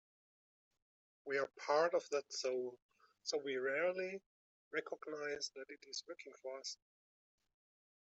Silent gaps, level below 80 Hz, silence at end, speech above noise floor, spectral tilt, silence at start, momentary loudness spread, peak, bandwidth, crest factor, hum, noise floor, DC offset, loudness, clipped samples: 2.82-2.89 s, 4.26-4.71 s; under -90 dBFS; 1.4 s; over 49 dB; -2 dB/octave; 1.25 s; 14 LU; -22 dBFS; 8.2 kHz; 20 dB; none; under -90 dBFS; under 0.1%; -41 LUFS; under 0.1%